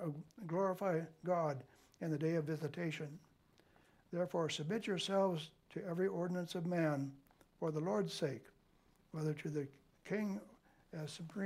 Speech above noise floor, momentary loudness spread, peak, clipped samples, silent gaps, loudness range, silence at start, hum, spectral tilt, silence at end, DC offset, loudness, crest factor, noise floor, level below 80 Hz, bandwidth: 32 dB; 12 LU; -24 dBFS; under 0.1%; none; 4 LU; 0 s; none; -6 dB/octave; 0 s; under 0.1%; -40 LUFS; 16 dB; -71 dBFS; -78 dBFS; 15 kHz